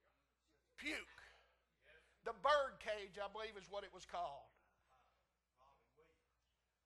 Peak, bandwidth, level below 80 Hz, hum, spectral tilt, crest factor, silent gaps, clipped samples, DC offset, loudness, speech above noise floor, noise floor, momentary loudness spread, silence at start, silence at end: -24 dBFS; 12 kHz; -76 dBFS; none; -2.5 dB/octave; 24 dB; none; under 0.1%; under 0.1%; -45 LUFS; 37 dB; -87 dBFS; 15 LU; 0.8 s; 2.4 s